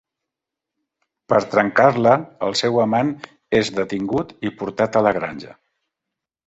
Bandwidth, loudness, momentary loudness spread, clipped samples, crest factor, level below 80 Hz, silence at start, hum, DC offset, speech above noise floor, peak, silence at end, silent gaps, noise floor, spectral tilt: 8.2 kHz; -19 LUFS; 12 LU; under 0.1%; 20 dB; -56 dBFS; 1.3 s; none; under 0.1%; 66 dB; -2 dBFS; 0.95 s; none; -85 dBFS; -5.5 dB/octave